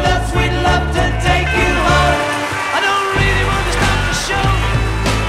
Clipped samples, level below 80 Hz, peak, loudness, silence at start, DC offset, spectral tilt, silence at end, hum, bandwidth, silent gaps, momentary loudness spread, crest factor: under 0.1%; -22 dBFS; -2 dBFS; -15 LUFS; 0 s; under 0.1%; -4.5 dB/octave; 0 s; none; 15 kHz; none; 4 LU; 14 dB